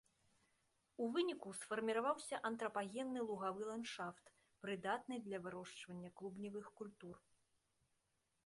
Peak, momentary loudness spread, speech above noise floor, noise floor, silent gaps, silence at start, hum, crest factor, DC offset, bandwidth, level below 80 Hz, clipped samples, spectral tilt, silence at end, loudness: -28 dBFS; 14 LU; 40 dB; -85 dBFS; none; 1 s; none; 20 dB; under 0.1%; 11.5 kHz; -86 dBFS; under 0.1%; -4.5 dB/octave; 1.3 s; -45 LUFS